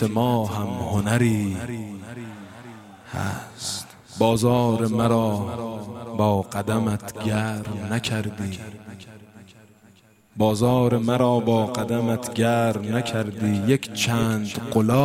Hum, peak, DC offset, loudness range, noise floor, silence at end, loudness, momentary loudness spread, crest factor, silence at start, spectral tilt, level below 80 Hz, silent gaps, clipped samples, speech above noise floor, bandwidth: none; -4 dBFS; under 0.1%; 6 LU; -55 dBFS; 0 s; -23 LUFS; 17 LU; 18 dB; 0 s; -6 dB/octave; -52 dBFS; none; under 0.1%; 33 dB; 16 kHz